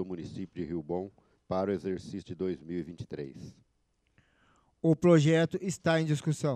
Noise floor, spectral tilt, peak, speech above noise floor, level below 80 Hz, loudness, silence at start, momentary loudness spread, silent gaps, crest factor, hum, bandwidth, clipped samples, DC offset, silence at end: -74 dBFS; -6.5 dB/octave; -10 dBFS; 44 dB; -64 dBFS; -30 LUFS; 0 s; 18 LU; none; 20 dB; none; 10.5 kHz; under 0.1%; under 0.1%; 0 s